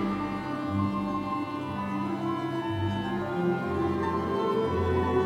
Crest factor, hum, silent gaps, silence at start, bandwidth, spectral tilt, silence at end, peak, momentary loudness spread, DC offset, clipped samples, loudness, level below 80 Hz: 14 dB; none; none; 0 s; 14.5 kHz; -8 dB/octave; 0 s; -14 dBFS; 5 LU; under 0.1%; under 0.1%; -29 LUFS; -54 dBFS